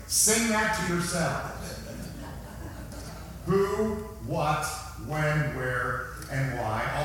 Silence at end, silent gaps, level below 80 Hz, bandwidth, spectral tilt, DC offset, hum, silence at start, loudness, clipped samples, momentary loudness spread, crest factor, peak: 0 s; none; -44 dBFS; 18 kHz; -3.5 dB/octave; under 0.1%; none; 0 s; -28 LUFS; under 0.1%; 17 LU; 18 dB; -12 dBFS